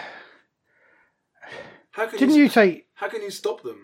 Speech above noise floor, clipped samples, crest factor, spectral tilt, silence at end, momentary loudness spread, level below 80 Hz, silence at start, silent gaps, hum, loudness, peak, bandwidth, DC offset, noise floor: 44 dB; under 0.1%; 18 dB; -5 dB/octave; 0.1 s; 24 LU; -80 dBFS; 0 s; none; none; -21 LUFS; -4 dBFS; 16 kHz; under 0.1%; -64 dBFS